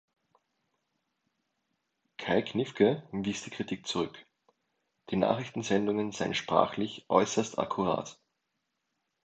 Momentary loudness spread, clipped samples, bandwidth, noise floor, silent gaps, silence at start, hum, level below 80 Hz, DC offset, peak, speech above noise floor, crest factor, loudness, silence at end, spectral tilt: 9 LU; under 0.1%; 9 kHz; -82 dBFS; none; 2.2 s; none; -66 dBFS; under 0.1%; -6 dBFS; 52 dB; 26 dB; -31 LUFS; 1.1 s; -5 dB/octave